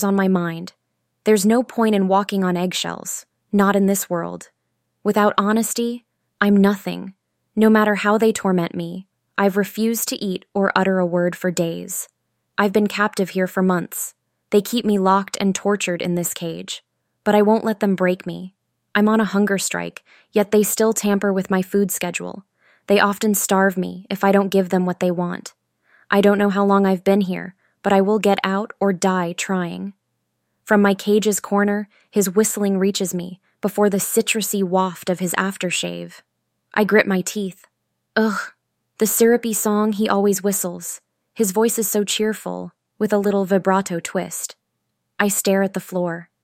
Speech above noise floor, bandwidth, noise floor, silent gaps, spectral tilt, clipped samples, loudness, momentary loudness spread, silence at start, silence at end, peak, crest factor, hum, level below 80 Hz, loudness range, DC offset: 56 dB; 16.5 kHz; -74 dBFS; none; -4.5 dB/octave; under 0.1%; -19 LUFS; 13 LU; 0 s; 0.2 s; -2 dBFS; 18 dB; none; -64 dBFS; 2 LU; under 0.1%